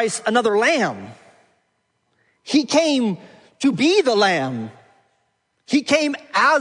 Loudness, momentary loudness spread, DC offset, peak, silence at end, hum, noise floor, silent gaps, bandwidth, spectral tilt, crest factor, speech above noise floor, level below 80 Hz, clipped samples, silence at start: -18 LUFS; 13 LU; under 0.1%; -4 dBFS; 0 s; none; -69 dBFS; none; 10.5 kHz; -3.5 dB/octave; 18 dB; 51 dB; -70 dBFS; under 0.1%; 0 s